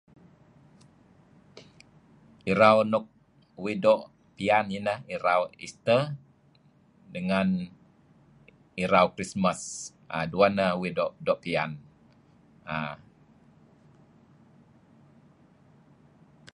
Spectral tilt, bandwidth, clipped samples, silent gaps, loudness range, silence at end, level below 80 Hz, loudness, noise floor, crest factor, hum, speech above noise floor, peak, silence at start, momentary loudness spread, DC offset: -5.5 dB/octave; 11 kHz; under 0.1%; none; 12 LU; 3.6 s; -62 dBFS; -27 LUFS; -61 dBFS; 24 dB; none; 35 dB; -6 dBFS; 1.55 s; 15 LU; under 0.1%